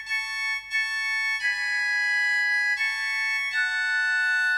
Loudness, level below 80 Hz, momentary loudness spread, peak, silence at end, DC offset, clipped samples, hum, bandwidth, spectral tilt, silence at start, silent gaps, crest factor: -23 LUFS; -64 dBFS; 4 LU; -14 dBFS; 0 s; under 0.1%; under 0.1%; 50 Hz at -75 dBFS; 15 kHz; 3.5 dB/octave; 0 s; none; 10 dB